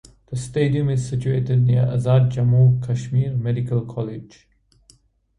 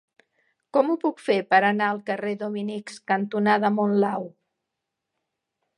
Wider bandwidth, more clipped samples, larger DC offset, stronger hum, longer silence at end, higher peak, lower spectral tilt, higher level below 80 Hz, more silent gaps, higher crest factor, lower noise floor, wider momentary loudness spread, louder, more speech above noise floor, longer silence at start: about the same, 10.5 kHz vs 10.5 kHz; neither; neither; neither; second, 1.15 s vs 1.5 s; about the same, -6 dBFS vs -4 dBFS; first, -8 dB/octave vs -6.5 dB/octave; first, -48 dBFS vs -78 dBFS; neither; second, 14 dB vs 20 dB; second, -56 dBFS vs -83 dBFS; about the same, 13 LU vs 11 LU; first, -20 LUFS vs -24 LUFS; second, 37 dB vs 60 dB; second, 0.3 s vs 0.75 s